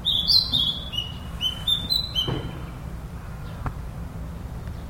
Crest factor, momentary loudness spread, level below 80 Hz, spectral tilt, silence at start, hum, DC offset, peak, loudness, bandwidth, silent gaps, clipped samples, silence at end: 20 dB; 19 LU; -38 dBFS; -4 dB/octave; 0 s; none; under 0.1%; -6 dBFS; -23 LUFS; 16.5 kHz; none; under 0.1%; 0 s